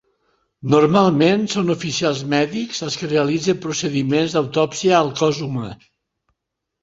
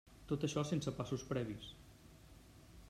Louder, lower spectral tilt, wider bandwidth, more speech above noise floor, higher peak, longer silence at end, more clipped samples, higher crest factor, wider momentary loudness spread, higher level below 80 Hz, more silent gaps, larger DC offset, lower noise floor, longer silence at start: first, -18 LUFS vs -41 LUFS; about the same, -5 dB/octave vs -6 dB/octave; second, 8 kHz vs 14.5 kHz; first, 61 dB vs 20 dB; first, -2 dBFS vs -24 dBFS; first, 1.05 s vs 0 s; neither; about the same, 18 dB vs 18 dB; second, 10 LU vs 23 LU; first, -56 dBFS vs -62 dBFS; neither; neither; first, -79 dBFS vs -60 dBFS; first, 0.65 s vs 0.05 s